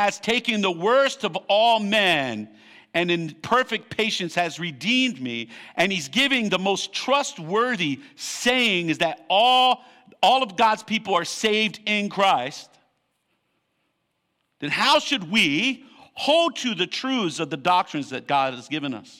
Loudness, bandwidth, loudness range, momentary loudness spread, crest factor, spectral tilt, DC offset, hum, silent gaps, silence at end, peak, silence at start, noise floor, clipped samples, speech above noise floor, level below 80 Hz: -22 LUFS; 16 kHz; 4 LU; 10 LU; 16 dB; -3.5 dB/octave; under 0.1%; none; none; 0.15 s; -6 dBFS; 0 s; -74 dBFS; under 0.1%; 51 dB; -66 dBFS